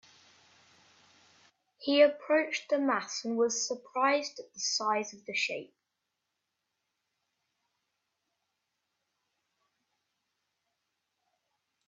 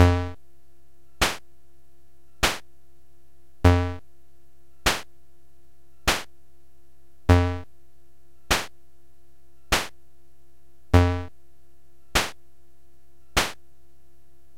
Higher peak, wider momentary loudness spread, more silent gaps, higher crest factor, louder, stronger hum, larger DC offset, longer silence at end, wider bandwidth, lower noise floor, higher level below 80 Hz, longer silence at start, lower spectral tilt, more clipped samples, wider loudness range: second, -10 dBFS vs -2 dBFS; second, 10 LU vs 16 LU; neither; about the same, 24 dB vs 26 dB; second, -30 LUFS vs -25 LUFS; neither; second, under 0.1% vs 1%; first, 6.2 s vs 1.05 s; second, 7.8 kHz vs 16.5 kHz; first, -85 dBFS vs -61 dBFS; second, -84 dBFS vs -38 dBFS; first, 1.8 s vs 0 s; second, -1.5 dB/octave vs -4.5 dB/octave; neither; first, 10 LU vs 4 LU